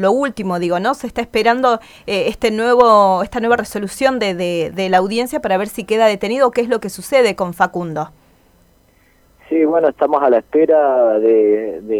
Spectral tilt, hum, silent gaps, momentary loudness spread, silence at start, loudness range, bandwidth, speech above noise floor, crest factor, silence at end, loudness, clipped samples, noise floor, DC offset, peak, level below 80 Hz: -5 dB/octave; none; none; 8 LU; 0 s; 4 LU; 17 kHz; 38 dB; 16 dB; 0 s; -15 LUFS; under 0.1%; -53 dBFS; under 0.1%; 0 dBFS; -48 dBFS